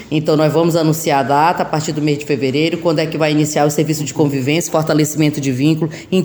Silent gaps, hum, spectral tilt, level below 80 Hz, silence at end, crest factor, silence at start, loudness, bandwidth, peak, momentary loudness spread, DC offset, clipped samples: none; none; -5.5 dB/octave; -52 dBFS; 0 s; 14 dB; 0 s; -15 LUFS; over 20 kHz; -2 dBFS; 4 LU; under 0.1%; under 0.1%